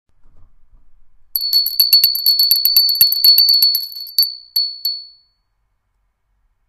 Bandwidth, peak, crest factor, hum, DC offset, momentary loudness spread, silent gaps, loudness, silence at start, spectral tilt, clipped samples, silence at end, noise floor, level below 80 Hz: 16 kHz; 0 dBFS; 16 dB; none; under 0.1%; 12 LU; none; -11 LUFS; 0.35 s; 3.5 dB/octave; under 0.1%; 1.6 s; -66 dBFS; -54 dBFS